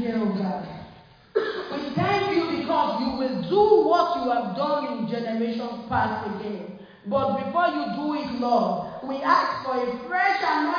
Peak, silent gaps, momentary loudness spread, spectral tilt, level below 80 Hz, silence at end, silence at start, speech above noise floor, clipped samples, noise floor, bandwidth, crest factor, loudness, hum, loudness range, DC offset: -6 dBFS; none; 10 LU; -7 dB/octave; -58 dBFS; 0 s; 0 s; 24 dB; under 0.1%; -49 dBFS; 5.2 kHz; 18 dB; -24 LUFS; none; 4 LU; under 0.1%